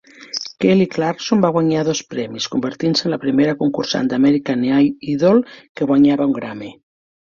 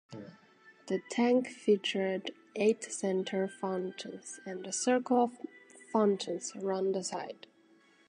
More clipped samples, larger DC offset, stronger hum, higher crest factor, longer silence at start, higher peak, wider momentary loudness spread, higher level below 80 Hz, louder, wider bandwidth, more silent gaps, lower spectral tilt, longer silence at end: neither; neither; neither; about the same, 16 dB vs 18 dB; about the same, 0.2 s vs 0.1 s; first, -2 dBFS vs -16 dBFS; second, 12 LU vs 15 LU; first, -58 dBFS vs -86 dBFS; first, -17 LUFS vs -32 LUFS; second, 7.4 kHz vs 10.5 kHz; first, 5.69-5.75 s vs none; about the same, -5.5 dB/octave vs -4.5 dB/octave; about the same, 0.65 s vs 0.75 s